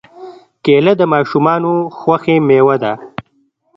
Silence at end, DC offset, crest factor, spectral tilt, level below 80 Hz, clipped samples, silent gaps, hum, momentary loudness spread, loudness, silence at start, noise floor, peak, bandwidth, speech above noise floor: 0.55 s; under 0.1%; 14 dB; -8.5 dB/octave; -56 dBFS; under 0.1%; none; none; 11 LU; -13 LUFS; 0.15 s; -59 dBFS; 0 dBFS; 6 kHz; 47 dB